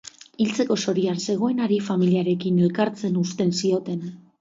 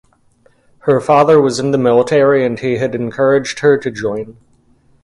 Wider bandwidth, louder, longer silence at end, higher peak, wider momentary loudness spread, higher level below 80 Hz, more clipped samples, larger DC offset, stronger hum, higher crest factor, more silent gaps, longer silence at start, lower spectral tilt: second, 7.8 kHz vs 11.5 kHz; second, -23 LUFS vs -13 LUFS; second, 0.25 s vs 0.7 s; second, -8 dBFS vs 0 dBFS; second, 5 LU vs 11 LU; second, -68 dBFS vs -52 dBFS; neither; neither; neither; about the same, 14 dB vs 14 dB; neither; second, 0.05 s vs 0.85 s; about the same, -6 dB/octave vs -6 dB/octave